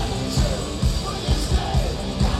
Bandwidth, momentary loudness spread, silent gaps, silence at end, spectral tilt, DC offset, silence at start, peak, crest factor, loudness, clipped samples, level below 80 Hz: 14 kHz; 2 LU; none; 0 s; -5 dB/octave; under 0.1%; 0 s; -8 dBFS; 14 dB; -23 LUFS; under 0.1%; -26 dBFS